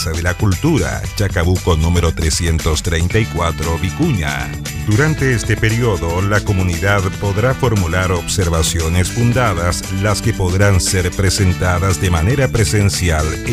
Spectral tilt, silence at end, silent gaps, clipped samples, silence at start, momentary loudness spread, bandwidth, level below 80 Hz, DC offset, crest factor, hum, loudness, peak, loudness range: -5 dB/octave; 0 s; none; under 0.1%; 0 s; 4 LU; 16 kHz; -28 dBFS; under 0.1%; 14 dB; none; -16 LUFS; 0 dBFS; 2 LU